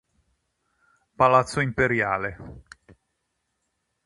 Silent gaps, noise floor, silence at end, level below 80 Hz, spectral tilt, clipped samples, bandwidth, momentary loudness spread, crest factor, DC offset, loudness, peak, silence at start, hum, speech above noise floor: none; -77 dBFS; 1.45 s; -52 dBFS; -6 dB/octave; under 0.1%; 11 kHz; 19 LU; 24 dB; under 0.1%; -22 LUFS; -4 dBFS; 1.2 s; none; 54 dB